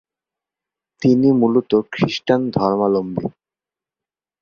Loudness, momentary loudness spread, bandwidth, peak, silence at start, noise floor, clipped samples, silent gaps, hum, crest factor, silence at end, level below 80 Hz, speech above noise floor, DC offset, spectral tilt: -18 LUFS; 9 LU; 7 kHz; -2 dBFS; 1 s; -90 dBFS; under 0.1%; none; none; 18 dB; 1.1 s; -56 dBFS; 73 dB; under 0.1%; -7.5 dB/octave